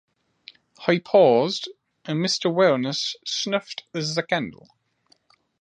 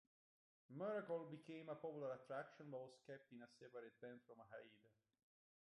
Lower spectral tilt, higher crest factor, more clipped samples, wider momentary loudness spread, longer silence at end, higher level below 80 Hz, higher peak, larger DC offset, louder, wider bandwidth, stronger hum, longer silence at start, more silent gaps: second, -4.5 dB/octave vs -7 dB/octave; about the same, 22 dB vs 18 dB; neither; about the same, 14 LU vs 13 LU; first, 1.05 s vs 0.85 s; first, -72 dBFS vs under -90 dBFS; first, -2 dBFS vs -38 dBFS; neither; first, -22 LUFS vs -54 LUFS; second, 9.8 kHz vs 11 kHz; neither; about the same, 0.8 s vs 0.7 s; neither